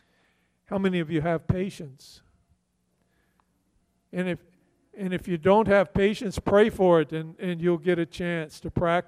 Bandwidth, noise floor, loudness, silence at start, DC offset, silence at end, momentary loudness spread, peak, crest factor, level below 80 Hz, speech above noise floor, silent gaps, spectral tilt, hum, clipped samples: 13.5 kHz; -72 dBFS; -25 LUFS; 0.7 s; under 0.1%; 0.05 s; 13 LU; -6 dBFS; 20 dB; -50 dBFS; 47 dB; none; -7 dB/octave; none; under 0.1%